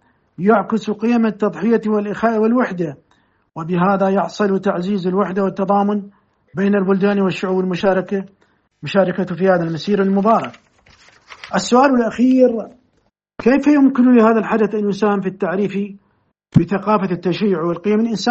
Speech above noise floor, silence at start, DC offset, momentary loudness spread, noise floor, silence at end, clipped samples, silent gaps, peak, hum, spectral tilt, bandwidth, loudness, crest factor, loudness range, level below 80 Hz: 48 dB; 0.4 s; under 0.1%; 10 LU; -64 dBFS; 0 s; under 0.1%; none; 0 dBFS; none; -7 dB/octave; 8 kHz; -17 LUFS; 16 dB; 4 LU; -56 dBFS